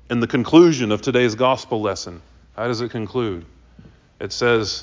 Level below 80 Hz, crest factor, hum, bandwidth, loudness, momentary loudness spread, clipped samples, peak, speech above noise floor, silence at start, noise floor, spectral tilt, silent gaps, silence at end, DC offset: -48 dBFS; 18 dB; none; 7.6 kHz; -19 LUFS; 18 LU; under 0.1%; -2 dBFS; 29 dB; 0.1 s; -48 dBFS; -5.5 dB/octave; none; 0 s; under 0.1%